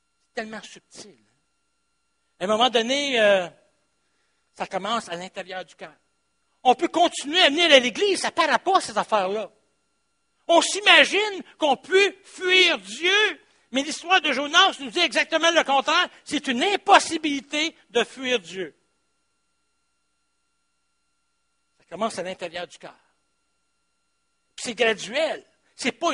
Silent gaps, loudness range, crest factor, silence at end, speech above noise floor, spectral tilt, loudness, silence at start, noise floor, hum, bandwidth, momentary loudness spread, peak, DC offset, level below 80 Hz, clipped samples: none; 16 LU; 24 dB; 0 s; 52 dB; -1.5 dB/octave; -21 LUFS; 0.35 s; -75 dBFS; none; 10.5 kHz; 18 LU; 0 dBFS; under 0.1%; -72 dBFS; under 0.1%